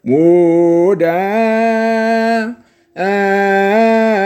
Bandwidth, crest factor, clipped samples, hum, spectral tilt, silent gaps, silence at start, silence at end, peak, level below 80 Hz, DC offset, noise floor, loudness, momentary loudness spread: 15 kHz; 12 dB; under 0.1%; none; -7 dB/octave; none; 0.05 s; 0 s; 0 dBFS; -64 dBFS; under 0.1%; -32 dBFS; -12 LUFS; 6 LU